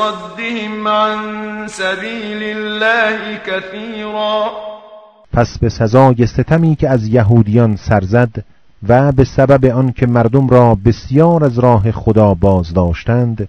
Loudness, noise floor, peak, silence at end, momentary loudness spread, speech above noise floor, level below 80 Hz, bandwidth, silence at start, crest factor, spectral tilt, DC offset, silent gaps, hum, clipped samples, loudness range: -13 LUFS; -39 dBFS; 0 dBFS; 0 s; 11 LU; 27 dB; -32 dBFS; 9.2 kHz; 0 s; 12 dB; -7.5 dB/octave; under 0.1%; none; none; 0.7%; 6 LU